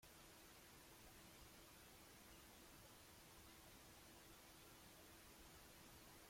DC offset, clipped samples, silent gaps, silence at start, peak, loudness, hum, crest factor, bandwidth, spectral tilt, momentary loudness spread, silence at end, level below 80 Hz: under 0.1%; under 0.1%; none; 0 s; -52 dBFS; -63 LUFS; none; 14 dB; 16.5 kHz; -2.5 dB/octave; 0 LU; 0 s; -76 dBFS